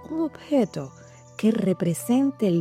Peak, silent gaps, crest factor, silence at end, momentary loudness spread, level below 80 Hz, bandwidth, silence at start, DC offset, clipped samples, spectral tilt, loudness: -10 dBFS; none; 14 dB; 0 s; 13 LU; -66 dBFS; 16 kHz; 0 s; under 0.1%; under 0.1%; -7 dB/octave; -24 LUFS